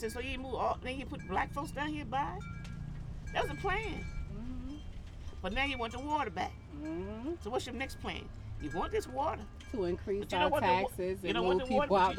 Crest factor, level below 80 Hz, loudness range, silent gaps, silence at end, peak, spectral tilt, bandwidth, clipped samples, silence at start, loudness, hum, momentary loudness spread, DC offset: 18 dB; -46 dBFS; 5 LU; none; 0 s; -16 dBFS; -5.5 dB/octave; 17.5 kHz; under 0.1%; 0 s; -36 LUFS; none; 14 LU; under 0.1%